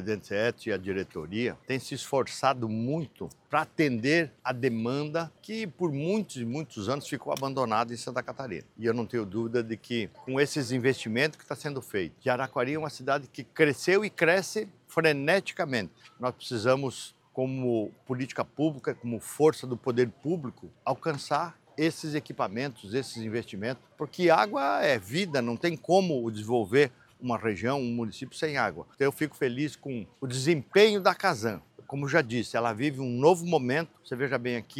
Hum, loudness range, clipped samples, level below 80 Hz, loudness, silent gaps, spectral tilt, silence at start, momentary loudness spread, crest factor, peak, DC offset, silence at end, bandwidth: none; 5 LU; under 0.1%; -72 dBFS; -29 LUFS; none; -5.5 dB/octave; 0 s; 11 LU; 22 dB; -6 dBFS; under 0.1%; 0 s; 16.5 kHz